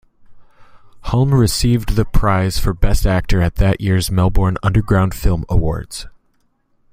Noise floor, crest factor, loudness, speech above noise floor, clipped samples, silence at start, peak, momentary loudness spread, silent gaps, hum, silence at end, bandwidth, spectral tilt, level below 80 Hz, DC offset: -60 dBFS; 14 dB; -17 LUFS; 46 dB; under 0.1%; 0.3 s; -2 dBFS; 6 LU; none; none; 0.85 s; 16 kHz; -6 dB/octave; -22 dBFS; under 0.1%